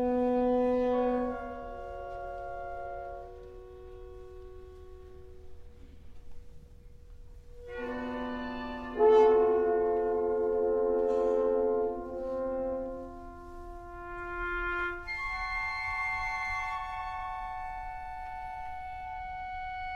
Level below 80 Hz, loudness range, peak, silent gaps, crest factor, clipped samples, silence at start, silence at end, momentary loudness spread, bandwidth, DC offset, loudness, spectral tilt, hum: -50 dBFS; 19 LU; -14 dBFS; none; 18 dB; under 0.1%; 0 s; 0 s; 21 LU; 7 kHz; under 0.1%; -31 LUFS; -6.5 dB/octave; none